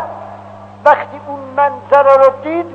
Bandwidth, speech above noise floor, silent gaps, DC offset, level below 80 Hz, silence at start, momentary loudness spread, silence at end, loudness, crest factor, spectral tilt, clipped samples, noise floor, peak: 6.6 kHz; 22 dB; none; 0.1%; -60 dBFS; 0 s; 18 LU; 0 s; -12 LUFS; 14 dB; -6.5 dB/octave; 0.4%; -34 dBFS; 0 dBFS